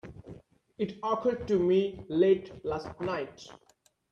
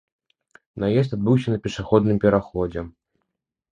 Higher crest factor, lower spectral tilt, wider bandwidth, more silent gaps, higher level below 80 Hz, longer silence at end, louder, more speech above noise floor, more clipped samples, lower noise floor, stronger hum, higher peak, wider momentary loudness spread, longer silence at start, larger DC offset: about the same, 18 dB vs 20 dB; about the same, -7.5 dB/octave vs -8 dB/octave; second, 7.2 kHz vs 9.4 kHz; neither; second, -60 dBFS vs -46 dBFS; second, 0.6 s vs 0.85 s; second, -30 LUFS vs -21 LUFS; second, 23 dB vs 59 dB; neither; second, -52 dBFS vs -79 dBFS; neither; second, -14 dBFS vs -2 dBFS; first, 23 LU vs 13 LU; second, 0.05 s vs 0.75 s; neither